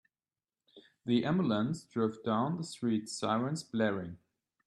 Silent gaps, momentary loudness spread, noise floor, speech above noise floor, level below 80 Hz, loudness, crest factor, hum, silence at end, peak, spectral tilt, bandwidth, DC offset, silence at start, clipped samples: none; 5 LU; under -90 dBFS; over 58 dB; -72 dBFS; -33 LUFS; 16 dB; none; 0.5 s; -18 dBFS; -6 dB/octave; 12 kHz; under 0.1%; 0.75 s; under 0.1%